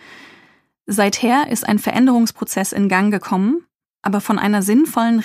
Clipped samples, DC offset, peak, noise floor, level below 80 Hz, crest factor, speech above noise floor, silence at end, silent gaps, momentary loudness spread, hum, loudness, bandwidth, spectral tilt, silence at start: under 0.1%; under 0.1%; 0 dBFS; -53 dBFS; -62 dBFS; 16 dB; 37 dB; 0 s; 3.75-3.79 s; 7 LU; none; -17 LUFS; 15.5 kHz; -5 dB/octave; 0.1 s